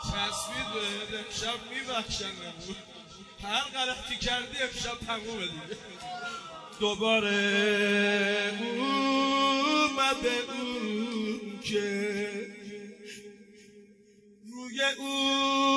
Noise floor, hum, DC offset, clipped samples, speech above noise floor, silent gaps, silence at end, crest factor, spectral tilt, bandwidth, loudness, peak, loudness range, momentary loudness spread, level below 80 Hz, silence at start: -58 dBFS; none; under 0.1%; under 0.1%; 28 dB; none; 0 s; 18 dB; -3 dB/octave; 11 kHz; -29 LUFS; -12 dBFS; 9 LU; 17 LU; -56 dBFS; 0 s